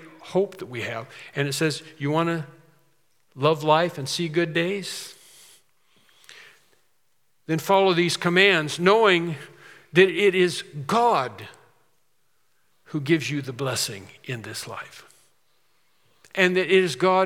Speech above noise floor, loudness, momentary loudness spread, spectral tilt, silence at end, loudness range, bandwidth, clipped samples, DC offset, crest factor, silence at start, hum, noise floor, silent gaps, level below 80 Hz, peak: 50 dB; -23 LUFS; 17 LU; -4.5 dB/octave; 0 s; 9 LU; 16 kHz; under 0.1%; under 0.1%; 22 dB; 0 s; none; -72 dBFS; none; -78 dBFS; -2 dBFS